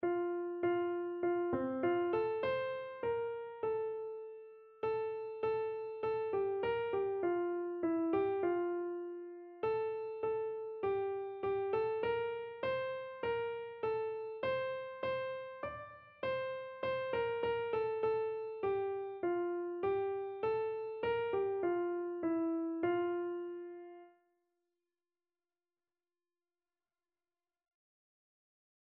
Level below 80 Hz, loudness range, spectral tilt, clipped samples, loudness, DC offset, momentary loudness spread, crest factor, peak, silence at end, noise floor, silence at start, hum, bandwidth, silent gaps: -72 dBFS; 4 LU; -4.5 dB/octave; under 0.1%; -38 LUFS; under 0.1%; 7 LU; 14 dB; -24 dBFS; 4.8 s; under -90 dBFS; 0 s; none; 5.2 kHz; none